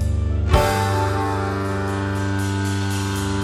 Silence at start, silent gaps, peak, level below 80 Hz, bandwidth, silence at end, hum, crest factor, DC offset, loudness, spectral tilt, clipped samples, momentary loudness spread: 0 s; none; 0 dBFS; -28 dBFS; 15.5 kHz; 0 s; none; 20 dB; under 0.1%; -21 LUFS; -6 dB/octave; under 0.1%; 5 LU